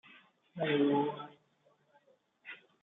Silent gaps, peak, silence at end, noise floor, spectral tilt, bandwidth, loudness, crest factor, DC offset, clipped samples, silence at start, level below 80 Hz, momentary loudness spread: none; -20 dBFS; 0.25 s; -72 dBFS; -4.5 dB/octave; 4 kHz; -32 LUFS; 18 dB; under 0.1%; under 0.1%; 0.55 s; -86 dBFS; 23 LU